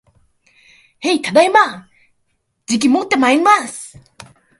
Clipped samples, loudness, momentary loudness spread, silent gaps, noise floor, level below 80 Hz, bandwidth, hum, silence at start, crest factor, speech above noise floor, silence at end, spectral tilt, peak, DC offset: under 0.1%; -14 LUFS; 22 LU; none; -67 dBFS; -60 dBFS; 11.5 kHz; none; 1 s; 18 dB; 53 dB; 0.75 s; -3 dB/octave; 0 dBFS; under 0.1%